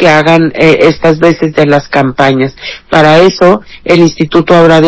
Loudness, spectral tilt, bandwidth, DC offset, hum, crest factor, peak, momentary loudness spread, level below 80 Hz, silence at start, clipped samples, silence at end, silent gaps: -7 LUFS; -6 dB/octave; 8 kHz; under 0.1%; none; 6 dB; 0 dBFS; 6 LU; -38 dBFS; 0 s; 10%; 0 s; none